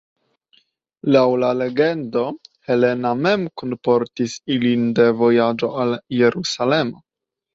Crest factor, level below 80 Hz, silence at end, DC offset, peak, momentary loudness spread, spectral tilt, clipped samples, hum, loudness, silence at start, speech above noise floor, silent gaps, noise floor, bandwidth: 18 dB; -62 dBFS; 0.6 s; under 0.1%; -2 dBFS; 9 LU; -6 dB/octave; under 0.1%; none; -19 LUFS; 1.05 s; 67 dB; none; -85 dBFS; 7.8 kHz